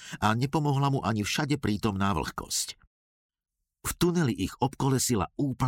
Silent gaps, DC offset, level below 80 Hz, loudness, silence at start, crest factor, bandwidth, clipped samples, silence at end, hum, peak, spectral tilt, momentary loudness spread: 2.87-3.29 s; under 0.1%; -50 dBFS; -28 LUFS; 0 s; 16 dB; 17 kHz; under 0.1%; 0 s; none; -12 dBFS; -5 dB/octave; 6 LU